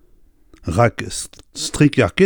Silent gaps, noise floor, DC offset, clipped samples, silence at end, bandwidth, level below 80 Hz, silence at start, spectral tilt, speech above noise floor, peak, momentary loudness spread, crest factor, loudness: none; -50 dBFS; under 0.1%; under 0.1%; 0 s; over 20 kHz; -40 dBFS; 0.65 s; -5.5 dB/octave; 33 dB; 0 dBFS; 15 LU; 18 dB; -19 LUFS